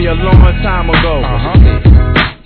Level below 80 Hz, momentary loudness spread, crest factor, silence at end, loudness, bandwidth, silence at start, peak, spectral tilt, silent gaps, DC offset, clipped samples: -10 dBFS; 6 LU; 8 dB; 0.1 s; -9 LUFS; 4.9 kHz; 0 s; 0 dBFS; -9.5 dB/octave; none; under 0.1%; 4%